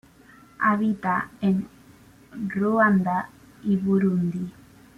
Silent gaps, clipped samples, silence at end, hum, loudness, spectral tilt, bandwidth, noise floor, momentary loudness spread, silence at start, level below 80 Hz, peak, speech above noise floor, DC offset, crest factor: none; under 0.1%; 0.45 s; none; -24 LUFS; -9 dB/octave; 6.4 kHz; -52 dBFS; 15 LU; 0.6 s; -60 dBFS; -8 dBFS; 29 dB; under 0.1%; 18 dB